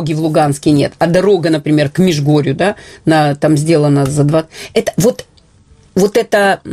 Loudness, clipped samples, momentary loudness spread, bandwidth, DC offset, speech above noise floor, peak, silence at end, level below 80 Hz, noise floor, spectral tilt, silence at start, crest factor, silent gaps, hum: -13 LUFS; under 0.1%; 6 LU; 15 kHz; under 0.1%; 34 dB; 0 dBFS; 0 s; -44 dBFS; -46 dBFS; -6 dB/octave; 0 s; 12 dB; none; none